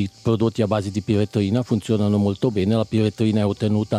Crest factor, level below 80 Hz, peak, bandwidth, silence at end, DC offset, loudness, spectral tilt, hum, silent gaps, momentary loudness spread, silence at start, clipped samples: 14 dB; -56 dBFS; -6 dBFS; 11 kHz; 0 s; under 0.1%; -21 LUFS; -7.5 dB/octave; none; none; 2 LU; 0 s; under 0.1%